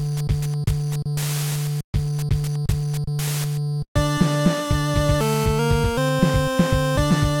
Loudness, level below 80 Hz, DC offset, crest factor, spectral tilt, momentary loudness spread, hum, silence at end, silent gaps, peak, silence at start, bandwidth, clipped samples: -22 LUFS; -32 dBFS; under 0.1%; 18 dB; -6 dB/octave; 5 LU; none; 0 s; 1.84-1.93 s, 3.88-3.95 s; -4 dBFS; 0 s; 17.5 kHz; under 0.1%